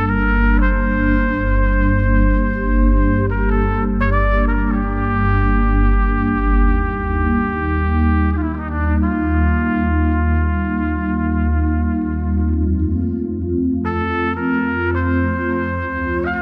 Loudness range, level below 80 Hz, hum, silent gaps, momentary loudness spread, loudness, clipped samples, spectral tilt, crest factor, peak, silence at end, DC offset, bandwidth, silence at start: 2 LU; -20 dBFS; none; none; 4 LU; -18 LUFS; under 0.1%; -10.5 dB/octave; 14 dB; -2 dBFS; 0 s; under 0.1%; 4.2 kHz; 0 s